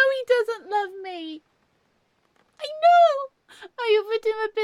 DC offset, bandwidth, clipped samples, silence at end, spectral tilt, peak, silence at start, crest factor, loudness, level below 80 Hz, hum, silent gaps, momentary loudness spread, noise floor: under 0.1%; 11 kHz; under 0.1%; 0 s; -1.5 dB/octave; -8 dBFS; 0 s; 16 dB; -22 LUFS; -78 dBFS; none; none; 21 LU; -68 dBFS